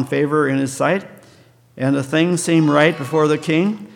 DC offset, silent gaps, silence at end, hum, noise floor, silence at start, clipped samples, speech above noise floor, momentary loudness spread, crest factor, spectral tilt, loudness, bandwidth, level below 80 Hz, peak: under 0.1%; none; 0.1 s; none; -49 dBFS; 0 s; under 0.1%; 32 dB; 5 LU; 18 dB; -5.5 dB/octave; -17 LUFS; 16.5 kHz; -68 dBFS; 0 dBFS